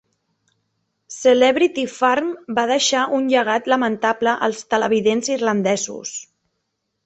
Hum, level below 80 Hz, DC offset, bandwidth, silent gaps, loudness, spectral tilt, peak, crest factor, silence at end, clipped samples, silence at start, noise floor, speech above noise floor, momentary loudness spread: none; -64 dBFS; under 0.1%; 8.4 kHz; none; -18 LUFS; -3 dB/octave; -2 dBFS; 18 dB; 0.8 s; under 0.1%; 1.1 s; -75 dBFS; 56 dB; 8 LU